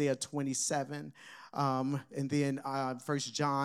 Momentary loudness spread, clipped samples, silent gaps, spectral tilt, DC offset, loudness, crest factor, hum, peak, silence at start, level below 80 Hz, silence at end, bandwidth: 10 LU; under 0.1%; none; -4.5 dB/octave; under 0.1%; -35 LUFS; 16 dB; none; -18 dBFS; 0 s; -84 dBFS; 0 s; 14.5 kHz